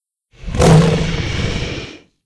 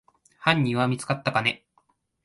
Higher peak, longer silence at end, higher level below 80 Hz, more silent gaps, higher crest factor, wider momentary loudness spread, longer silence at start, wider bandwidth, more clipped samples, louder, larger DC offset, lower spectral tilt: first, 0 dBFS vs -4 dBFS; second, 0.3 s vs 0.7 s; first, -26 dBFS vs -62 dBFS; neither; second, 16 dB vs 22 dB; first, 20 LU vs 5 LU; about the same, 0.4 s vs 0.4 s; about the same, 11 kHz vs 11.5 kHz; neither; first, -15 LUFS vs -24 LUFS; neither; about the same, -6 dB/octave vs -5.5 dB/octave